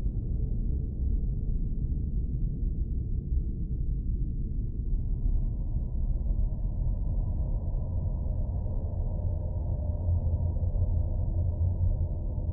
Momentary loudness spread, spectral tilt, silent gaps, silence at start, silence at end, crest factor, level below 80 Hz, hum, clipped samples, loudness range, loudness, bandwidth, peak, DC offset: 4 LU; -16.5 dB/octave; none; 0 s; 0 s; 12 dB; -30 dBFS; none; under 0.1%; 3 LU; -32 LUFS; 1.1 kHz; -16 dBFS; under 0.1%